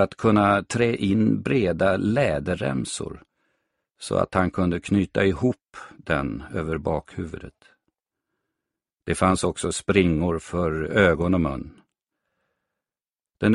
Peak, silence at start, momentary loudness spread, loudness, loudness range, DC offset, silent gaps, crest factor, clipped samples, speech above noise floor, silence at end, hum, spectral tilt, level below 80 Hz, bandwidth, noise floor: -4 dBFS; 0 s; 15 LU; -23 LUFS; 6 LU; under 0.1%; none; 20 dB; under 0.1%; over 67 dB; 0 s; none; -6 dB/octave; -44 dBFS; 11.5 kHz; under -90 dBFS